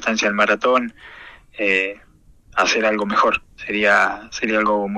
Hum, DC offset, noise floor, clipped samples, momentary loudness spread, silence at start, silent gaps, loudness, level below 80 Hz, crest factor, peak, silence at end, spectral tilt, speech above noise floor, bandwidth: none; under 0.1%; -49 dBFS; under 0.1%; 10 LU; 0 s; none; -18 LUFS; -52 dBFS; 18 dB; -2 dBFS; 0 s; -3 dB/octave; 30 dB; 10.5 kHz